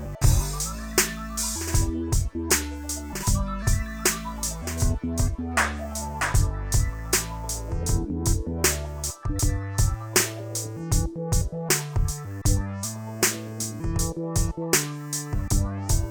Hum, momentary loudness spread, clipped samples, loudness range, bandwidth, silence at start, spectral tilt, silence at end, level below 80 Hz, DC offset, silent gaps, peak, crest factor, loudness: none; 7 LU; under 0.1%; 1 LU; over 20 kHz; 0 s; -3.5 dB/octave; 0 s; -30 dBFS; under 0.1%; none; -4 dBFS; 22 dB; -26 LUFS